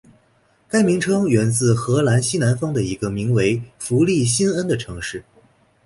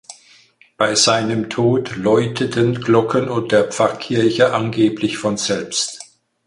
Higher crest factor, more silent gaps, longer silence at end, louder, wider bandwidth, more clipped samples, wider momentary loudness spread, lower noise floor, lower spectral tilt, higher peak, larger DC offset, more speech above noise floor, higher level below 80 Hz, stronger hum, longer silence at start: about the same, 16 dB vs 16 dB; neither; first, 0.65 s vs 0.4 s; about the same, -19 LUFS vs -17 LUFS; about the same, 11.5 kHz vs 11.5 kHz; neither; about the same, 8 LU vs 6 LU; first, -59 dBFS vs -51 dBFS; about the same, -5.5 dB/octave vs -4.5 dB/octave; second, -4 dBFS vs 0 dBFS; neither; first, 41 dB vs 34 dB; first, -48 dBFS vs -54 dBFS; neither; first, 0.75 s vs 0.1 s